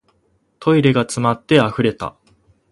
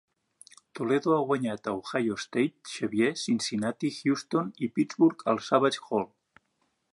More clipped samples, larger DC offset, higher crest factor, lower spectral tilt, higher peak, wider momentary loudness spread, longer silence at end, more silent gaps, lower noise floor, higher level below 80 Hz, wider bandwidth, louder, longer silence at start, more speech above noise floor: neither; neither; about the same, 18 dB vs 20 dB; about the same, -6 dB/octave vs -5 dB/octave; first, 0 dBFS vs -8 dBFS; first, 11 LU vs 7 LU; second, 0.65 s vs 0.85 s; neither; second, -62 dBFS vs -75 dBFS; first, -52 dBFS vs -72 dBFS; about the same, 11.5 kHz vs 11.5 kHz; first, -17 LUFS vs -28 LUFS; second, 0.6 s vs 0.75 s; about the same, 46 dB vs 48 dB